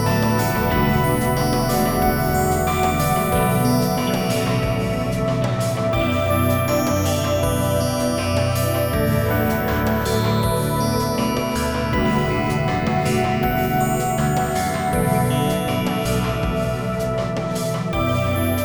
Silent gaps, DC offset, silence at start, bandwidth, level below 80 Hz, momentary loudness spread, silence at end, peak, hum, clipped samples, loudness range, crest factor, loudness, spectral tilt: none; 0.3%; 0 s; over 20 kHz; -34 dBFS; 3 LU; 0 s; -6 dBFS; none; under 0.1%; 2 LU; 14 dB; -20 LUFS; -5.5 dB/octave